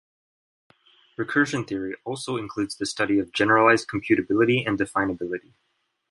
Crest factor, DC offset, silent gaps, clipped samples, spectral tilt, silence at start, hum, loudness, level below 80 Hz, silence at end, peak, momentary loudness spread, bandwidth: 22 dB; under 0.1%; none; under 0.1%; -5 dB/octave; 1.2 s; none; -23 LUFS; -58 dBFS; 0.7 s; -4 dBFS; 13 LU; 11.5 kHz